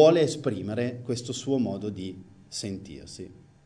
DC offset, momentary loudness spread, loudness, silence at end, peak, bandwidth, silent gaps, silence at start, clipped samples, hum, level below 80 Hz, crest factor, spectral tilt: under 0.1%; 16 LU; -29 LUFS; 0.35 s; -6 dBFS; 10 kHz; none; 0 s; under 0.1%; none; -62 dBFS; 22 dB; -5.5 dB/octave